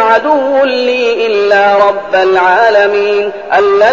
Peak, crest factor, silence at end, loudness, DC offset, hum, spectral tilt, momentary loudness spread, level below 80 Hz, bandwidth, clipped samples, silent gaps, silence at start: 0 dBFS; 8 dB; 0 s; -9 LUFS; 0.6%; none; -4 dB/octave; 4 LU; -52 dBFS; 7.4 kHz; 0.3%; none; 0 s